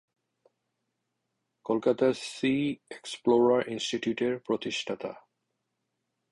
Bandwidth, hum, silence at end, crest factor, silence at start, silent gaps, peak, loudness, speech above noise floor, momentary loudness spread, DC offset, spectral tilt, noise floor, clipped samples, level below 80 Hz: 11.5 kHz; none; 1.15 s; 18 dB; 1.65 s; none; -12 dBFS; -28 LUFS; 54 dB; 14 LU; under 0.1%; -5 dB/octave; -82 dBFS; under 0.1%; -70 dBFS